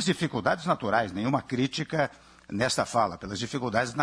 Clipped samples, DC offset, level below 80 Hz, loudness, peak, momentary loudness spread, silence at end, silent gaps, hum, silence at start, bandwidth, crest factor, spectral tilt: under 0.1%; under 0.1%; -58 dBFS; -28 LUFS; -8 dBFS; 6 LU; 0 s; none; none; 0 s; 11 kHz; 20 dB; -4.5 dB/octave